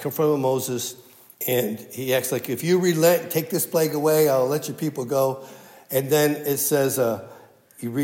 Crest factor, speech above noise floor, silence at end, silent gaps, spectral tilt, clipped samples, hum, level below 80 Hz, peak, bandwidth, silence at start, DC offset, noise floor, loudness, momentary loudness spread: 18 dB; 26 dB; 0 s; none; -4.5 dB/octave; under 0.1%; none; -76 dBFS; -6 dBFS; 16.5 kHz; 0 s; under 0.1%; -48 dBFS; -22 LUFS; 10 LU